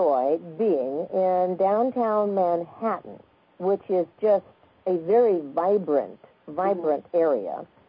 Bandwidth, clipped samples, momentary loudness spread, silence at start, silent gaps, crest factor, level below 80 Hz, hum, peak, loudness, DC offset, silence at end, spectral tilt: 5.2 kHz; under 0.1%; 7 LU; 0 s; none; 14 dB; -74 dBFS; none; -10 dBFS; -24 LUFS; under 0.1%; 0.25 s; -11.5 dB/octave